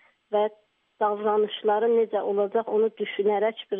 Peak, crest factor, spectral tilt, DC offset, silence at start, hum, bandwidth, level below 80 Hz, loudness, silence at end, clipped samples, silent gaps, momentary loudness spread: -12 dBFS; 12 dB; -3 dB/octave; under 0.1%; 0.3 s; none; 3.8 kHz; -84 dBFS; -25 LUFS; 0 s; under 0.1%; none; 5 LU